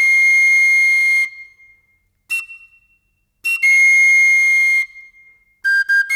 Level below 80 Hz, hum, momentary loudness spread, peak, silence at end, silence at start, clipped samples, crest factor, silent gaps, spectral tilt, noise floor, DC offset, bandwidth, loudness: -70 dBFS; none; 14 LU; -8 dBFS; 0 s; 0 s; under 0.1%; 8 dB; none; 5.5 dB/octave; -64 dBFS; under 0.1%; 17.5 kHz; -11 LUFS